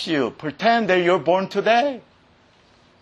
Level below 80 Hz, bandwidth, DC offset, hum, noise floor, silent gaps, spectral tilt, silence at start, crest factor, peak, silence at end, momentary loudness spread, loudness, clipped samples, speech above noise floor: -66 dBFS; 9.6 kHz; under 0.1%; none; -55 dBFS; none; -5.5 dB/octave; 0 s; 16 dB; -4 dBFS; 1 s; 9 LU; -20 LUFS; under 0.1%; 36 dB